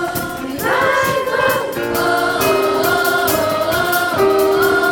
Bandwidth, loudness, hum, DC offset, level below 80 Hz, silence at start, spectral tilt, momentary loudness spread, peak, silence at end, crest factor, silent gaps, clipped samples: 18 kHz; -15 LUFS; none; under 0.1%; -46 dBFS; 0 s; -3.5 dB/octave; 6 LU; -2 dBFS; 0 s; 14 dB; none; under 0.1%